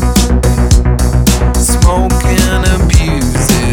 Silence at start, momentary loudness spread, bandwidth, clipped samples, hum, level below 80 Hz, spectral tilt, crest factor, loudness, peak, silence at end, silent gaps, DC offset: 0 s; 2 LU; 18 kHz; 0.3%; none; -12 dBFS; -5 dB/octave; 8 dB; -11 LUFS; 0 dBFS; 0 s; none; under 0.1%